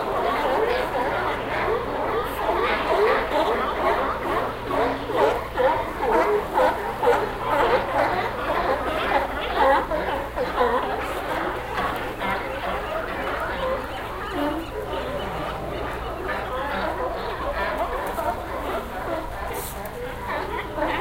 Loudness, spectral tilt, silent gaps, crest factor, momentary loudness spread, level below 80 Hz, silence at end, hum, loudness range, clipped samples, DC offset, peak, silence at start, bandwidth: -24 LUFS; -5 dB/octave; none; 18 dB; 9 LU; -40 dBFS; 0 s; none; 6 LU; under 0.1%; under 0.1%; -6 dBFS; 0 s; 16 kHz